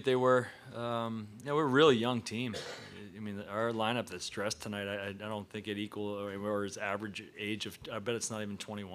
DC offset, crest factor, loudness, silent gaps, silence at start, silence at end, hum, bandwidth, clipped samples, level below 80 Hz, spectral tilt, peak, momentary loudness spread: under 0.1%; 22 dB; -34 LUFS; none; 0 s; 0 s; none; 15.5 kHz; under 0.1%; -74 dBFS; -4.5 dB/octave; -12 dBFS; 14 LU